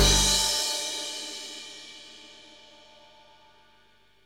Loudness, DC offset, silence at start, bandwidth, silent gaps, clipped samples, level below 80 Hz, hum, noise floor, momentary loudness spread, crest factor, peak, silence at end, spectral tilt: -25 LUFS; under 0.1%; 0 s; 17 kHz; none; under 0.1%; -38 dBFS; 50 Hz at -70 dBFS; -62 dBFS; 26 LU; 22 dB; -8 dBFS; 1.9 s; -1.5 dB/octave